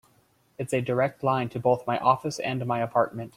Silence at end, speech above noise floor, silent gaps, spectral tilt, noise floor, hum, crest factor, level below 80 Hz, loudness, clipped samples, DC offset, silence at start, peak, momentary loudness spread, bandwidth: 0.1 s; 38 dB; none; -6 dB/octave; -64 dBFS; none; 20 dB; -64 dBFS; -26 LUFS; under 0.1%; under 0.1%; 0.6 s; -6 dBFS; 6 LU; 15.5 kHz